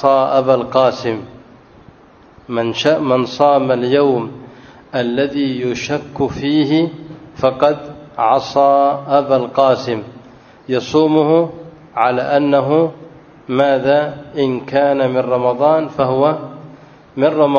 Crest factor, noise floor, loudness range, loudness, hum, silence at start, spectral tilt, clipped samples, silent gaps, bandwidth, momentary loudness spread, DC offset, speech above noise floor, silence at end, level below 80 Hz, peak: 16 dB; -44 dBFS; 2 LU; -15 LUFS; none; 0 s; -6.5 dB/octave; under 0.1%; none; 7 kHz; 11 LU; under 0.1%; 30 dB; 0 s; -54 dBFS; 0 dBFS